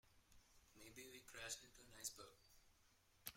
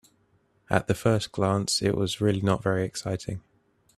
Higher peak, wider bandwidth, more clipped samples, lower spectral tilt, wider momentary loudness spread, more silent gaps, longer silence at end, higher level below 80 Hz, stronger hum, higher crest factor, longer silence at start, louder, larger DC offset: second, -30 dBFS vs -6 dBFS; first, 16.5 kHz vs 13.5 kHz; neither; second, -1 dB/octave vs -5 dB/octave; first, 12 LU vs 8 LU; neither; second, 0 s vs 0.6 s; second, -78 dBFS vs -54 dBFS; neither; first, 30 dB vs 22 dB; second, 0.05 s vs 0.7 s; second, -56 LUFS vs -26 LUFS; neither